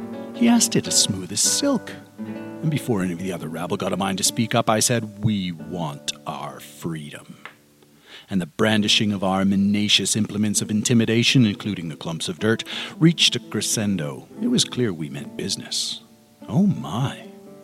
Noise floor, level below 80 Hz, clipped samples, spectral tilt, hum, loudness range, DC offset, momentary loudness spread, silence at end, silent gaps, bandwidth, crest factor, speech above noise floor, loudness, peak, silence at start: -54 dBFS; -60 dBFS; under 0.1%; -3.5 dB/octave; none; 5 LU; under 0.1%; 15 LU; 0 s; none; 16 kHz; 20 dB; 32 dB; -21 LUFS; -4 dBFS; 0 s